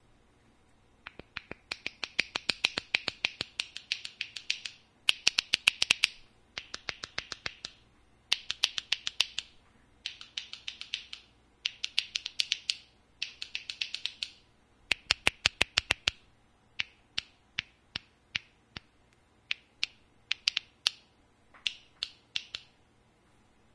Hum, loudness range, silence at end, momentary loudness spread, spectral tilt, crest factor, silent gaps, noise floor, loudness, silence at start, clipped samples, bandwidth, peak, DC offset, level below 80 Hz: none; 7 LU; 1.15 s; 17 LU; 0.5 dB/octave; 34 dB; none; -65 dBFS; -32 LUFS; 1.35 s; under 0.1%; 11 kHz; -4 dBFS; under 0.1%; -62 dBFS